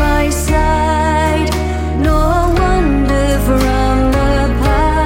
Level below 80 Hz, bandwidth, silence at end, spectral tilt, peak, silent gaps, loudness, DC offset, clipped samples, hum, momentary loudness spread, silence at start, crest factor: -16 dBFS; 17 kHz; 0 s; -6 dB/octave; 0 dBFS; none; -14 LUFS; under 0.1%; under 0.1%; none; 2 LU; 0 s; 12 dB